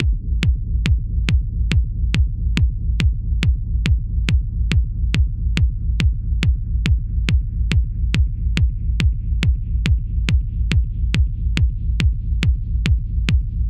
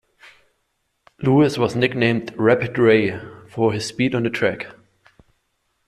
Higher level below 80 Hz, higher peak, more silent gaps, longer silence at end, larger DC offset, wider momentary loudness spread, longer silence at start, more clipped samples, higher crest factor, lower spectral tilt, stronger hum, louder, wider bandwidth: first, -20 dBFS vs -56 dBFS; about the same, -2 dBFS vs -4 dBFS; neither; second, 0 s vs 1.15 s; neither; second, 1 LU vs 12 LU; second, 0 s vs 1.2 s; neither; about the same, 16 dB vs 18 dB; about the same, -6 dB/octave vs -6.5 dB/octave; neither; about the same, -21 LUFS vs -19 LUFS; second, 9.2 kHz vs 13 kHz